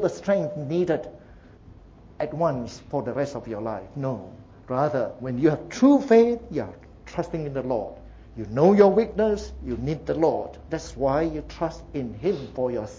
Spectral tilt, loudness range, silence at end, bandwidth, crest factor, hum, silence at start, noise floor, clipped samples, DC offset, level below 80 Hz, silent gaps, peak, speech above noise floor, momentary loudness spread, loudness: -7.5 dB/octave; 7 LU; 0 s; 7.8 kHz; 20 dB; none; 0 s; -48 dBFS; under 0.1%; under 0.1%; -46 dBFS; none; -4 dBFS; 24 dB; 15 LU; -25 LUFS